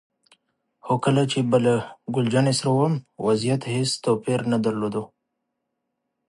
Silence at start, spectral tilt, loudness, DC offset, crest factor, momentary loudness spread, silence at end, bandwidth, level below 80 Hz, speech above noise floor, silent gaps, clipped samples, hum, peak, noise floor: 0.85 s; -6 dB/octave; -23 LUFS; under 0.1%; 18 dB; 7 LU; 1.25 s; 11.5 kHz; -64 dBFS; 57 dB; none; under 0.1%; none; -6 dBFS; -79 dBFS